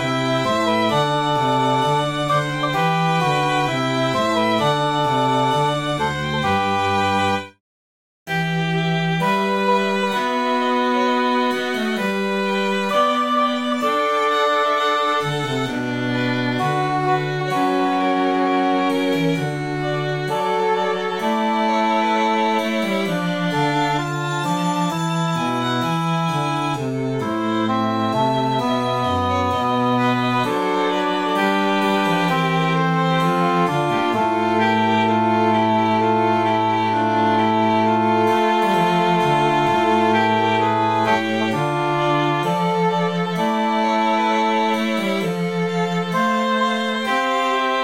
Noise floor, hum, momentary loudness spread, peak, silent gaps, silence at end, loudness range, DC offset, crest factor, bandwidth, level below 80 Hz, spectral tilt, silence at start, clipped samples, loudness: under -90 dBFS; none; 4 LU; -6 dBFS; 7.60-8.26 s; 0 s; 3 LU; 0.2%; 14 dB; 16.5 kHz; -56 dBFS; -5.5 dB/octave; 0 s; under 0.1%; -19 LUFS